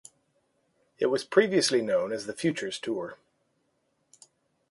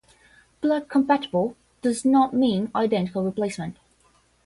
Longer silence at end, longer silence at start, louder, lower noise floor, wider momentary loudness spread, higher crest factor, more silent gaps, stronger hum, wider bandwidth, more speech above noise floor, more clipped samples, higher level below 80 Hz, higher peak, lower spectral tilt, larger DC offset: first, 1.55 s vs 0.75 s; first, 1 s vs 0.6 s; second, -27 LUFS vs -23 LUFS; first, -74 dBFS vs -62 dBFS; about the same, 10 LU vs 9 LU; first, 22 dB vs 16 dB; neither; neither; about the same, 11.5 kHz vs 11.5 kHz; first, 47 dB vs 39 dB; neither; second, -74 dBFS vs -62 dBFS; about the same, -8 dBFS vs -8 dBFS; second, -4 dB/octave vs -6 dB/octave; neither